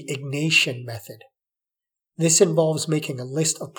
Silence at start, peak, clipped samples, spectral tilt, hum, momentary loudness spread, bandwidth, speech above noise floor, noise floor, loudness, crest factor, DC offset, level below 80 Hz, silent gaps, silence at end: 0 s; -4 dBFS; under 0.1%; -3.5 dB/octave; none; 15 LU; 19.5 kHz; 67 dB; -89 dBFS; -20 LUFS; 20 dB; under 0.1%; -80 dBFS; none; 0.1 s